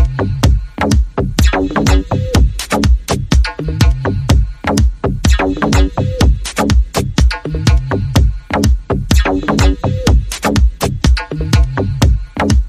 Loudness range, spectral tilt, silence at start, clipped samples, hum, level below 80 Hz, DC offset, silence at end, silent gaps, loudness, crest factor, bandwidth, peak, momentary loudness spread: 0 LU; -5.5 dB/octave; 0 s; under 0.1%; none; -14 dBFS; under 0.1%; 0 s; none; -14 LUFS; 12 dB; 15 kHz; 0 dBFS; 3 LU